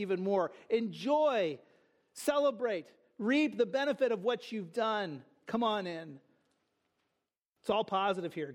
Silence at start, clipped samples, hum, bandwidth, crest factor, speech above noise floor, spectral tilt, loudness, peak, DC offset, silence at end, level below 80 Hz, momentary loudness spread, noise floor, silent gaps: 0 s; under 0.1%; none; 15.5 kHz; 16 dB; 53 dB; -5 dB/octave; -33 LUFS; -16 dBFS; under 0.1%; 0 s; -80 dBFS; 12 LU; -86 dBFS; 7.45-7.53 s